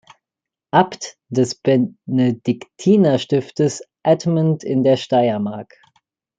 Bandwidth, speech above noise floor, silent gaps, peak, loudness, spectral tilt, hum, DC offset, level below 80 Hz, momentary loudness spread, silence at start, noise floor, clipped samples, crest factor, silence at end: 9.2 kHz; 69 dB; none; -2 dBFS; -18 LUFS; -6.5 dB/octave; none; under 0.1%; -62 dBFS; 9 LU; 0.75 s; -87 dBFS; under 0.1%; 16 dB; 0.75 s